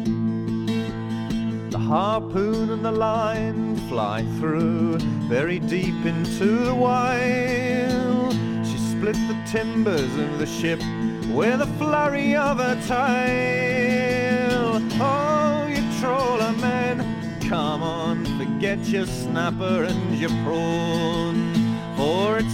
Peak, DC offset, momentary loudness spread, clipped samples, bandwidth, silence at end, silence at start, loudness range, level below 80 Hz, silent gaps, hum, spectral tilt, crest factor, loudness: -6 dBFS; under 0.1%; 5 LU; under 0.1%; 15.5 kHz; 0 s; 0 s; 3 LU; -44 dBFS; none; none; -6 dB/octave; 16 dB; -23 LUFS